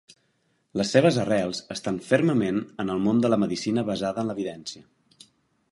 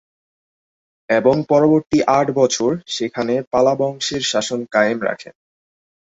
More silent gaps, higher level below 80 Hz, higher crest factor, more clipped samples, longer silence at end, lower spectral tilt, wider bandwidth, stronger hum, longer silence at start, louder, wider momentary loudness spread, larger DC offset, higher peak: second, none vs 3.47-3.51 s; about the same, -60 dBFS vs -56 dBFS; first, 22 dB vs 16 dB; neither; first, 0.9 s vs 0.75 s; first, -6 dB/octave vs -4.5 dB/octave; first, 11.5 kHz vs 8 kHz; neither; second, 0.75 s vs 1.1 s; second, -25 LUFS vs -17 LUFS; first, 12 LU vs 8 LU; neither; about the same, -4 dBFS vs -2 dBFS